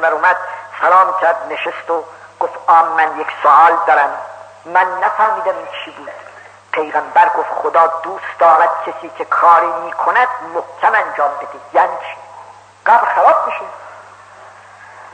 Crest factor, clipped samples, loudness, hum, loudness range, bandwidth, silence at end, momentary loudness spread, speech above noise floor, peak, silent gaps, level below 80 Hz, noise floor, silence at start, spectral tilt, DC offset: 14 dB; under 0.1%; -14 LUFS; none; 4 LU; 9.2 kHz; 0.05 s; 17 LU; 25 dB; 0 dBFS; none; -72 dBFS; -39 dBFS; 0 s; -3.5 dB/octave; under 0.1%